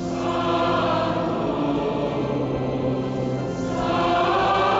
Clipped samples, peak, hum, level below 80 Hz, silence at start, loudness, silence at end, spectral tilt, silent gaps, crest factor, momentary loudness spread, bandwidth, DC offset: under 0.1%; -8 dBFS; none; -44 dBFS; 0 s; -23 LUFS; 0 s; -6.5 dB/octave; none; 14 dB; 6 LU; 8 kHz; under 0.1%